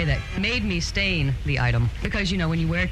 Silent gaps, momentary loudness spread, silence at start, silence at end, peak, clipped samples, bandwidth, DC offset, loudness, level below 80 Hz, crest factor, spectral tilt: none; 3 LU; 0 s; 0 s; -10 dBFS; under 0.1%; 11.5 kHz; under 0.1%; -24 LUFS; -32 dBFS; 14 dB; -5.5 dB/octave